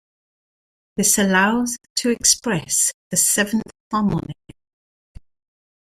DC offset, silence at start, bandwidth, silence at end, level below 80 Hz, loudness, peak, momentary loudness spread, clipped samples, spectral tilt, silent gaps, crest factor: under 0.1%; 0.95 s; 16 kHz; 1.5 s; -50 dBFS; -18 LUFS; -2 dBFS; 10 LU; under 0.1%; -2.5 dB/octave; 1.90-1.96 s, 2.94-3.11 s, 3.80-3.91 s; 20 dB